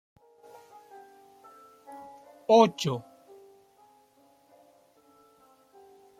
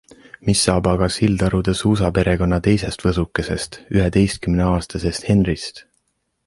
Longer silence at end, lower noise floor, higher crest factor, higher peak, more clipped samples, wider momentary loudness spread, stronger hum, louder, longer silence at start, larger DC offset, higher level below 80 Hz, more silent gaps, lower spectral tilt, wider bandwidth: first, 3.2 s vs 0.65 s; second, -63 dBFS vs -69 dBFS; first, 24 dB vs 16 dB; second, -8 dBFS vs -2 dBFS; neither; first, 31 LU vs 7 LU; neither; second, -24 LUFS vs -19 LUFS; first, 1.9 s vs 0.45 s; neither; second, -78 dBFS vs -32 dBFS; neither; about the same, -5.5 dB/octave vs -5.5 dB/octave; first, 15 kHz vs 11.5 kHz